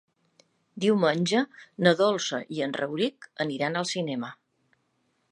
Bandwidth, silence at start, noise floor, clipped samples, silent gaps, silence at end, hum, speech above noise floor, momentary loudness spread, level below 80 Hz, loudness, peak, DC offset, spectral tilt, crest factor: 10.5 kHz; 0.75 s; -73 dBFS; under 0.1%; none; 0.95 s; none; 46 dB; 10 LU; -76 dBFS; -27 LUFS; -4 dBFS; under 0.1%; -4.5 dB/octave; 24 dB